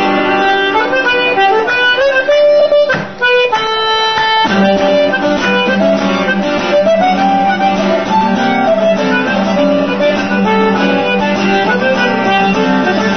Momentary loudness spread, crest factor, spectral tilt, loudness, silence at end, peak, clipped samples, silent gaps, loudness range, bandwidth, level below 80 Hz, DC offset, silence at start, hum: 3 LU; 10 dB; -5 dB/octave; -11 LUFS; 0 s; 0 dBFS; under 0.1%; none; 2 LU; 6.6 kHz; -46 dBFS; 1%; 0 s; none